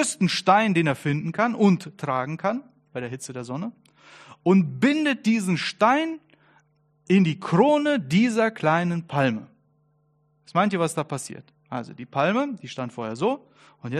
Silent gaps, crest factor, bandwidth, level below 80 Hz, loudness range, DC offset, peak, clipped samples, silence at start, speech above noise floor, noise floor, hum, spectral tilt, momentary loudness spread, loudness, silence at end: none; 20 dB; 13 kHz; -68 dBFS; 5 LU; under 0.1%; -4 dBFS; under 0.1%; 0 s; 43 dB; -66 dBFS; none; -5.5 dB/octave; 15 LU; -23 LUFS; 0 s